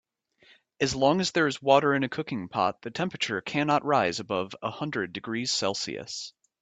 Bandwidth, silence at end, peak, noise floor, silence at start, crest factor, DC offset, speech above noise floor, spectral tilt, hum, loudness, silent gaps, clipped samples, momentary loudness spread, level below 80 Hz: 9.2 kHz; 0.3 s; -6 dBFS; -62 dBFS; 0.8 s; 22 dB; under 0.1%; 34 dB; -4 dB/octave; none; -27 LUFS; none; under 0.1%; 11 LU; -62 dBFS